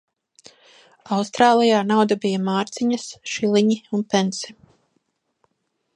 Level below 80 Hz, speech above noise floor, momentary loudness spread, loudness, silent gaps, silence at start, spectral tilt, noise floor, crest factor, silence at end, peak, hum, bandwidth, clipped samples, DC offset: -68 dBFS; 53 dB; 10 LU; -20 LUFS; none; 1.05 s; -5 dB/octave; -73 dBFS; 20 dB; 1.45 s; -2 dBFS; none; 10.5 kHz; under 0.1%; under 0.1%